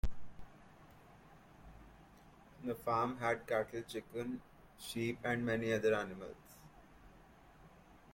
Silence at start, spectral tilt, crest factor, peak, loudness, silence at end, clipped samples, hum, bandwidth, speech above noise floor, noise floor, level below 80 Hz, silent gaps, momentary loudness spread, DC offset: 0.05 s; -5.5 dB/octave; 18 dB; -22 dBFS; -39 LUFS; 0 s; under 0.1%; none; 16.5 kHz; 23 dB; -62 dBFS; -54 dBFS; none; 26 LU; under 0.1%